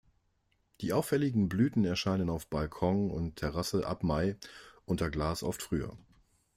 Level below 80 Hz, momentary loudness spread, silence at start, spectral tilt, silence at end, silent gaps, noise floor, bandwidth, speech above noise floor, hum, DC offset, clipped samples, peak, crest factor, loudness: -50 dBFS; 8 LU; 0.8 s; -6 dB/octave; 0.6 s; none; -75 dBFS; 16 kHz; 43 dB; none; under 0.1%; under 0.1%; -16 dBFS; 18 dB; -32 LUFS